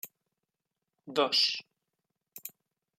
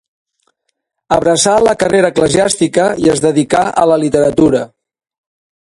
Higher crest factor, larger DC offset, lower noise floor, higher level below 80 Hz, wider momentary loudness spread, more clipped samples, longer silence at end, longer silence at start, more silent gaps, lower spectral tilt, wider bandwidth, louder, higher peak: first, 22 dB vs 12 dB; neither; first, -87 dBFS vs -70 dBFS; second, under -90 dBFS vs -44 dBFS; first, 21 LU vs 3 LU; neither; second, 0.5 s vs 1 s; second, 0.05 s vs 1.1 s; neither; second, -1.5 dB/octave vs -4.5 dB/octave; first, 16 kHz vs 11.5 kHz; second, -28 LUFS vs -11 LUFS; second, -14 dBFS vs 0 dBFS